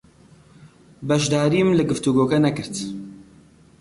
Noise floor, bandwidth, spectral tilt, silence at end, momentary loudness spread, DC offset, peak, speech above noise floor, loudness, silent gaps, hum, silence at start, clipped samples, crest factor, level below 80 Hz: -51 dBFS; 11.5 kHz; -5.5 dB/octave; 0.6 s; 16 LU; under 0.1%; -8 dBFS; 31 dB; -20 LUFS; none; none; 0.6 s; under 0.1%; 14 dB; -54 dBFS